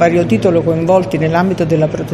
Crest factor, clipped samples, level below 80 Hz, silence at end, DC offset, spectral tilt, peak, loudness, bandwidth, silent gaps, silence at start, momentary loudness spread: 12 dB; under 0.1%; -42 dBFS; 0 s; under 0.1%; -7.5 dB/octave; 0 dBFS; -13 LUFS; 13 kHz; none; 0 s; 2 LU